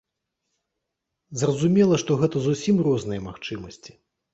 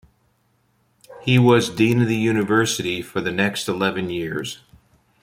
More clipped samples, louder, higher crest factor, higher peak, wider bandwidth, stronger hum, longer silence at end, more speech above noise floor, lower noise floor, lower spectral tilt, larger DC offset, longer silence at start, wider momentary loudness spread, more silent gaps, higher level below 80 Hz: neither; about the same, -22 LUFS vs -20 LUFS; about the same, 16 dB vs 18 dB; second, -8 dBFS vs -2 dBFS; second, 8.2 kHz vs 16 kHz; neither; second, 0.45 s vs 0.65 s; first, 59 dB vs 45 dB; first, -82 dBFS vs -64 dBFS; about the same, -6.5 dB/octave vs -5.5 dB/octave; neither; first, 1.3 s vs 1.1 s; first, 15 LU vs 12 LU; neither; about the same, -56 dBFS vs -56 dBFS